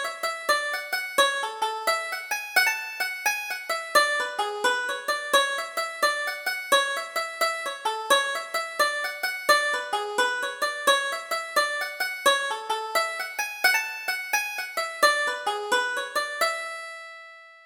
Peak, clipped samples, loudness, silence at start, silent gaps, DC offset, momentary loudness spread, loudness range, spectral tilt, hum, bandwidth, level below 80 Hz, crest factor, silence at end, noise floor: -6 dBFS; under 0.1%; -25 LUFS; 0 s; none; under 0.1%; 8 LU; 1 LU; 1.5 dB/octave; none; over 20 kHz; -70 dBFS; 20 dB; 0.05 s; -46 dBFS